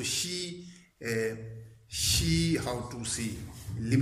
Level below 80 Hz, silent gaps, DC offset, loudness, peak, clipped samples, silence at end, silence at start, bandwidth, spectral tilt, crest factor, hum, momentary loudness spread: -46 dBFS; none; under 0.1%; -31 LUFS; -12 dBFS; under 0.1%; 0 s; 0 s; 15.5 kHz; -4 dB/octave; 18 dB; none; 18 LU